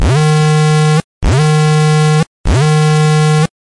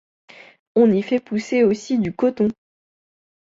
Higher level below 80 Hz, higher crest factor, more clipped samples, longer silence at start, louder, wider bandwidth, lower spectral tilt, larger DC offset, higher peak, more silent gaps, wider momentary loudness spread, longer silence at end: first, -24 dBFS vs -58 dBFS; second, 6 dB vs 16 dB; neither; second, 0 s vs 0.75 s; first, -11 LUFS vs -20 LUFS; first, 11.5 kHz vs 7.8 kHz; about the same, -6 dB/octave vs -7 dB/octave; neither; about the same, -4 dBFS vs -4 dBFS; first, 1.04-1.21 s, 2.27-2.44 s vs none; about the same, 4 LU vs 6 LU; second, 0.25 s vs 0.9 s